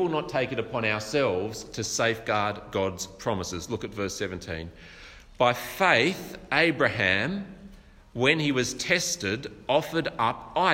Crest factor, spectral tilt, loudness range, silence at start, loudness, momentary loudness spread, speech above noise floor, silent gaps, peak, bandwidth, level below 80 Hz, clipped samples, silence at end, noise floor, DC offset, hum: 22 dB; -3.5 dB/octave; 5 LU; 0 s; -26 LUFS; 13 LU; 22 dB; none; -6 dBFS; 16 kHz; -54 dBFS; under 0.1%; 0 s; -49 dBFS; under 0.1%; none